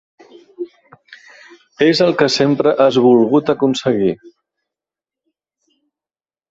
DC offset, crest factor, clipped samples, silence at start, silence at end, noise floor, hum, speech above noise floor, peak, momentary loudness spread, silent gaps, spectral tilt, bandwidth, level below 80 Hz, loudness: under 0.1%; 16 dB; under 0.1%; 0.6 s; 2.35 s; under -90 dBFS; none; over 77 dB; 0 dBFS; 20 LU; none; -5.5 dB/octave; 8 kHz; -58 dBFS; -14 LUFS